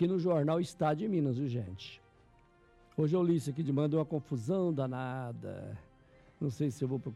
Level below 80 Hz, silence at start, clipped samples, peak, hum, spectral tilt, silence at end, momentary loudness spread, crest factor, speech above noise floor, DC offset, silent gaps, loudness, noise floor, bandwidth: -68 dBFS; 0 s; under 0.1%; -20 dBFS; none; -8 dB/octave; 0 s; 14 LU; 14 dB; 31 dB; under 0.1%; none; -34 LUFS; -64 dBFS; 12.5 kHz